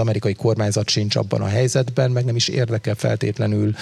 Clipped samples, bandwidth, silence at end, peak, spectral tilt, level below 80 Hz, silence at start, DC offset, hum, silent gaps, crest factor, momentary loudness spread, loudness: under 0.1%; 12.5 kHz; 0 s; -4 dBFS; -5.5 dB/octave; -56 dBFS; 0 s; under 0.1%; none; none; 16 dB; 3 LU; -20 LUFS